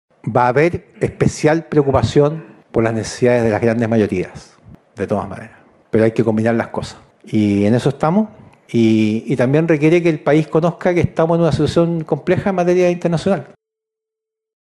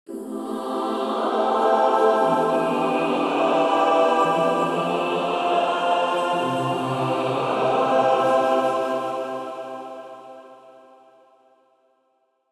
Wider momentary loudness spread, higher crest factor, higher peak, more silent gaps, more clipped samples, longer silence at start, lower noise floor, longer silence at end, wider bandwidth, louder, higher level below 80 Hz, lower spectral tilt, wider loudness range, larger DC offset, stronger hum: second, 9 LU vs 13 LU; about the same, 16 dB vs 16 dB; first, -2 dBFS vs -6 dBFS; neither; neither; first, 0.25 s vs 0.1 s; first, -83 dBFS vs -68 dBFS; second, 1.2 s vs 1.8 s; second, 11.5 kHz vs 13.5 kHz; first, -16 LUFS vs -21 LUFS; first, -44 dBFS vs -68 dBFS; first, -7 dB/octave vs -5.5 dB/octave; second, 4 LU vs 9 LU; neither; neither